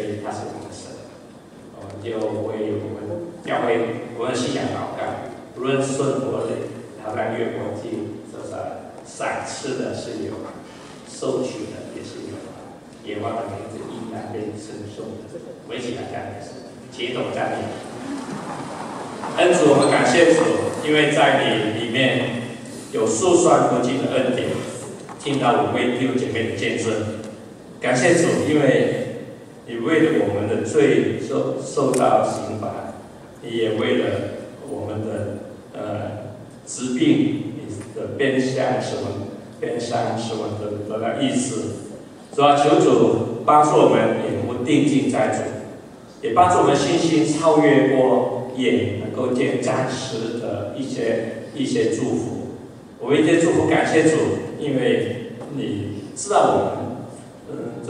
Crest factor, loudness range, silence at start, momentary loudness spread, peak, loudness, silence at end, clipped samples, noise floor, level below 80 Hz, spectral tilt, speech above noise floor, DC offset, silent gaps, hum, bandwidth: 20 dB; 12 LU; 0 s; 19 LU; 0 dBFS; -21 LUFS; 0 s; under 0.1%; -42 dBFS; -60 dBFS; -5 dB/octave; 22 dB; under 0.1%; none; none; 12.5 kHz